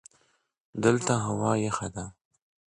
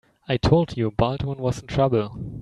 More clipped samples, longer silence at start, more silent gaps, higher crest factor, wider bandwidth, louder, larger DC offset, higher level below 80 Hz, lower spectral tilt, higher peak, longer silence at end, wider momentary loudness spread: neither; first, 0.75 s vs 0.3 s; neither; about the same, 22 dB vs 20 dB; about the same, 11 kHz vs 11 kHz; second, -27 LUFS vs -23 LUFS; neither; second, -58 dBFS vs -40 dBFS; second, -5.5 dB/octave vs -7.5 dB/octave; second, -8 dBFS vs -4 dBFS; first, 0.6 s vs 0 s; first, 16 LU vs 8 LU